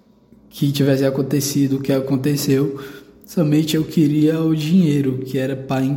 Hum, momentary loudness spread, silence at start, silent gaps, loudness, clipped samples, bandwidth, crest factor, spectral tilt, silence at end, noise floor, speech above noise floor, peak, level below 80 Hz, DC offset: none; 7 LU; 0.55 s; none; -18 LUFS; under 0.1%; 17 kHz; 14 dB; -6.5 dB/octave; 0 s; -50 dBFS; 32 dB; -4 dBFS; -56 dBFS; under 0.1%